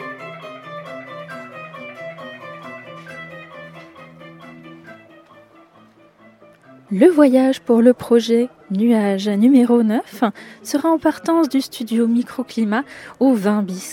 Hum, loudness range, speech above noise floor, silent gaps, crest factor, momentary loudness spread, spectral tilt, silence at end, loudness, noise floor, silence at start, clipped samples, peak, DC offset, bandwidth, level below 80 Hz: none; 21 LU; 34 dB; none; 18 dB; 22 LU; -6 dB/octave; 0 s; -17 LUFS; -50 dBFS; 0 s; under 0.1%; 0 dBFS; under 0.1%; 16.5 kHz; -68 dBFS